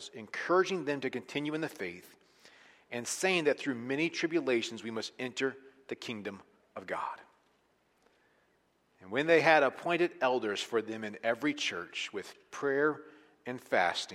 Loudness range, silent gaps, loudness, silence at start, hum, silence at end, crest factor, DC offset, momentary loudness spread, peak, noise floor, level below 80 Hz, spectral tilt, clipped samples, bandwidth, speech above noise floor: 11 LU; none; -32 LUFS; 0 s; none; 0 s; 24 dB; under 0.1%; 16 LU; -10 dBFS; -72 dBFS; -82 dBFS; -3.5 dB/octave; under 0.1%; 15.5 kHz; 40 dB